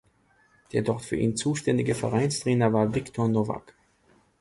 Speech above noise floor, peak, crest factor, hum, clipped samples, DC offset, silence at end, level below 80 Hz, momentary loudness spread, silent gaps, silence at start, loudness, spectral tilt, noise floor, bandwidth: 38 dB; -8 dBFS; 18 dB; none; under 0.1%; under 0.1%; 0.8 s; -56 dBFS; 6 LU; none; 0.75 s; -26 LUFS; -6 dB/octave; -64 dBFS; 11.5 kHz